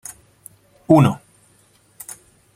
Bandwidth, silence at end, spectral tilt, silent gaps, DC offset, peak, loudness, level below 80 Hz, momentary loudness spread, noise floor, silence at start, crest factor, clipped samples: 16 kHz; 1.4 s; -7.5 dB/octave; none; under 0.1%; 0 dBFS; -15 LUFS; -58 dBFS; 24 LU; -56 dBFS; 0.9 s; 22 dB; under 0.1%